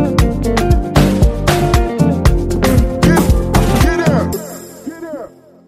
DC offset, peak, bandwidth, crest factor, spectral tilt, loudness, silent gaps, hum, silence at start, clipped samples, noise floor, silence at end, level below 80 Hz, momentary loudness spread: under 0.1%; 0 dBFS; 16 kHz; 12 dB; -6 dB/octave; -13 LUFS; none; none; 0 s; under 0.1%; -33 dBFS; 0.4 s; -18 dBFS; 16 LU